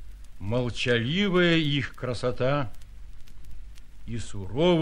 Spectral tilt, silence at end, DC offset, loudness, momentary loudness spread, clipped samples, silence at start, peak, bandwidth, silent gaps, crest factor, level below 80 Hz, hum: -6 dB/octave; 0 s; under 0.1%; -26 LUFS; 15 LU; under 0.1%; 0 s; -10 dBFS; 11 kHz; none; 16 dB; -44 dBFS; none